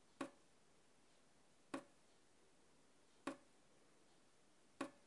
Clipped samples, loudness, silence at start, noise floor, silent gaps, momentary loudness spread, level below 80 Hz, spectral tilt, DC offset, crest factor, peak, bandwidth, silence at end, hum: under 0.1%; -55 LUFS; 0.2 s; -75 dBFS; none; 1 LU; under -90 dBFS; -4 dB/octave; under 0.1%; 26 dB; -34 dBFS; 11.5 kHz; 0.05 s; none